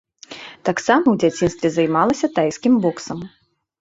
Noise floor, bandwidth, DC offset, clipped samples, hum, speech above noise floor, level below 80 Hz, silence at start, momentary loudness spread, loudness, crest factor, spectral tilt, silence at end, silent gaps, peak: -38 dBFS; 8 kHz; under 0.1%; under 0.1%; none; 21 dB; -52 dBFS; 0.3 s; 19 LU; -18 LUFS; 18 dB; -5.5 dB/octave; 0.5 s; none; -2 dBFS